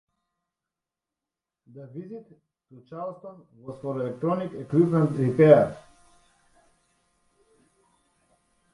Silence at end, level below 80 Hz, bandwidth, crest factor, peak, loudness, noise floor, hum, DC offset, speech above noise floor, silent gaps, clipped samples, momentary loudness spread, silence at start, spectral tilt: 2.95 s; -66 dBFS; 11 kHz; 24 dB; -4 dBFS; -23 LUFS; -89 dBFS; none; under 0.1%; 65 dB; none; under 0.1%; 28 LU; 1.75 s; -9.5 dB/octave